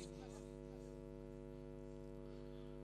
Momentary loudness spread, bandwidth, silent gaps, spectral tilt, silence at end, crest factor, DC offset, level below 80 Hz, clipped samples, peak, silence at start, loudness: 1 LU; 13 kHz; none; -6.5 dB/octave; 0 s; 14 dB; under 0.1%; -60 dBFS; under 0.1%; -38 dBFS; 0 s; -54 LUFS